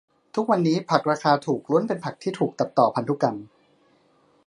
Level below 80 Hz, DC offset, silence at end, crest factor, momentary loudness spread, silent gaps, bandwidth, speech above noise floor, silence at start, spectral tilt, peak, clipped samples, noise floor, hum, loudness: -72 dBFS; under 0.1%; 1 s; 22 dB; 7 LU; none; 11 kHz; 39 dB; 0.35 s; -6.5 dB/octave; -2 dBFS; under 0.1%; -61 dBFS; none; -23 LUFS